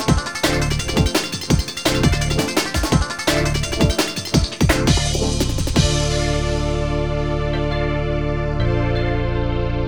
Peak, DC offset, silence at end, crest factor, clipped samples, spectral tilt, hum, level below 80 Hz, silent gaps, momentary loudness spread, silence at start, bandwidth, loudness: -2 dBFS; 0.4%; 0 s; 16 dB; under 0.1%; -4.5 dB/octave; none; -24 dBFS; none; 4 LU; 0 s; over 20 kHz; -19 LUFS